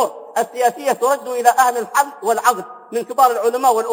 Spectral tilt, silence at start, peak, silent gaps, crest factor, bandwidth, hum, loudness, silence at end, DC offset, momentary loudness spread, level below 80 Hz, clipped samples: -2 dB/octave; 0 s; 0 dBFS; none; 18 dB; 17 kHz; none; -17 LUFS; 0 s; under 0.1%; 8 LU; -78 dBFS; under 0.1%